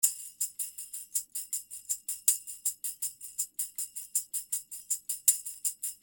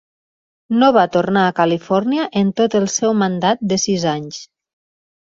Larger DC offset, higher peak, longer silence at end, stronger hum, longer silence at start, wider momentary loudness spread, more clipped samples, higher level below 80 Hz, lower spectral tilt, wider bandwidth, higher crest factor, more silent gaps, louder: neither; second, -8 dBFS vs -2 dBFS; second, 0.05 s vs 0.8 s; neither; second, 0 s vs 0.7 s; about the same, 10 LU vs 8 LU; neither; second, -78 dBFS vs -58 dBFS; second, 4.5 dB/octave vs -4.5 dB/octave; first, over 20 kHz vs 7.8 kHz; first, 28 dB vs 16 dB; neither; second, -32 LUFS vs -16 LUFS